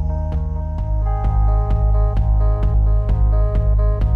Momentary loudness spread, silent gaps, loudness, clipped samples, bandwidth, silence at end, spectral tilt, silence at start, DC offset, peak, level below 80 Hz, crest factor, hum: 5 LU; none; -19 LUFS; under 0.1%; 2.3 kHz; 0 s; -10.5 dB/octave; 0 s; under 0.1%; -8 dBFS; -16 dBFS; 8 dB; none